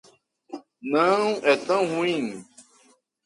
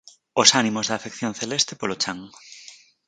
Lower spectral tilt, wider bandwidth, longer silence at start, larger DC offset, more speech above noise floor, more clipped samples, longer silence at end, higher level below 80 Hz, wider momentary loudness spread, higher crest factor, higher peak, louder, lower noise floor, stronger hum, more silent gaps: first, -4.5 dB/octave vs -2 dB/octave; about the same, 11.5 kHz vs 10.5 kHz; first, 0.5 s vs 0.35 s; neither; first, 38 dB vs 25 dB; neither; first, 0.65 s vs 0.35 s; second, -74 dBFS vs -66 dBFS; second, 21 LU vs 26 LU; about the same, 20 dB vs 24 dB; second, -6 dBFS vs 0 dBFS; about the same, -23 LUFS vs -21 LUFS; first, -61 dBFS vs -48 dBFS; neither; neither